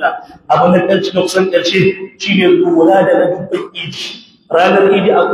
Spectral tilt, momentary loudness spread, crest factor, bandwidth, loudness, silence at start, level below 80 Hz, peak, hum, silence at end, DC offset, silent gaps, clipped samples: -5.5 dB/octave; 12 LU; 12 dB; 13 kHz; -12 LUFS; 0 s; -56 dBFS; 0 dBFS; none; 0 s; under 0.1%; none; under 0.1%